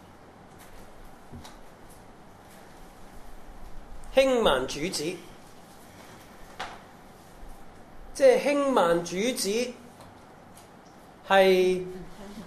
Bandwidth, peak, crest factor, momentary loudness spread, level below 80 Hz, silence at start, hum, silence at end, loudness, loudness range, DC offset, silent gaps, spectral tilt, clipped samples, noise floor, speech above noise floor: 14 kHz; -6 dBFS; 22 dB; 27 LU; -50 dBFS; 0.6 s; none; 0 s; -24 LUFS; 10 LU; under 0.1%; none; -4 dB/octave; under 0.1%; -50 dBFS; 27 dB